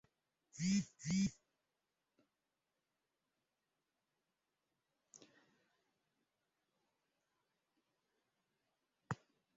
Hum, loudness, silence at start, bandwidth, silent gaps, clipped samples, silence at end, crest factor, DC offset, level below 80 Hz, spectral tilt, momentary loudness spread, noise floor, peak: none; -41 LUFS; 0.55 s; 7.6 kHz; none; under 0.1%; 0.45 s; 24 dB; under 0.1%; -76 dBFS; -6 dB/octave; 11 LU; -90 dBFS; -24 dBFS